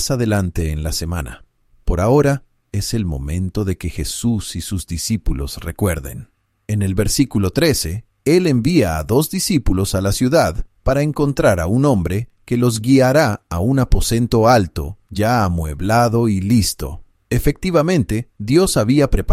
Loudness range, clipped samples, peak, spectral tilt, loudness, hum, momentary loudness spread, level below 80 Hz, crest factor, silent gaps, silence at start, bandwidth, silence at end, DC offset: 6 LU; under 0.1%; -2 dBFS; -5.5 dB/octave; -18 LUFS; none; 10 LU; -28 dBFS; 16 dB; none; 0 s; 16 kHz; 0 s; under 0.1%